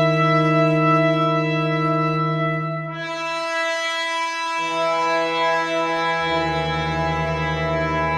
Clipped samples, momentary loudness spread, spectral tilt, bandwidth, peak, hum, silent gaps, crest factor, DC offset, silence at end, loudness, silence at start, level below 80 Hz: under 0.1%; 6 LU; -5.5 dB/octave; 10.5 kHz; -6 dBFS; none; none; 14 dB; under 0.1%; 0 s; -20 LUFS; 0 s; -44 dBFS